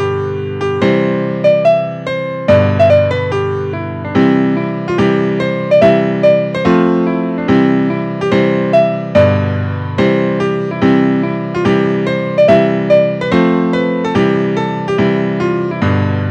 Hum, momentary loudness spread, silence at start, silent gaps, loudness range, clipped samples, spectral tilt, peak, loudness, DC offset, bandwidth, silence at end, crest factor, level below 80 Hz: none; 7 LU; 0 s; none; 1 LU; under 0.1%; -8 dB/octave; 0 dBFS; -13 LUFS; under 0.1%; 8.8 kHz; 0 s; 12 dB; -46 dBFS